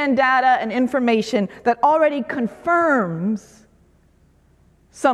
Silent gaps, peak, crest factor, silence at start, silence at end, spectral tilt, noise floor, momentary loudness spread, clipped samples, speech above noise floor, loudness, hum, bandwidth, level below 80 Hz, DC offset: none; -4 dBFS; 16 dB; 0 s; 0 s; -6 dB/octave; -56 dBFS; 8 LU; under 0.1%; 37 dB; -19 LUFS; none; 12 kHz; -58 dBFS; under 0.1%